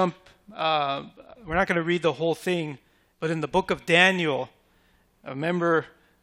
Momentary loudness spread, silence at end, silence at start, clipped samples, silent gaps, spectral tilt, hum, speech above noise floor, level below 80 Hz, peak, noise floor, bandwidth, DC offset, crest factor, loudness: 20 LU; 0.35 s; 0 s; under 0.1%; none; -5 dB/octave; none; 38 dB; -54 dBFS; -2 dBFS; -63 dBFS; 16 kHz; under 0.1%; 24 dB; -25 LUFS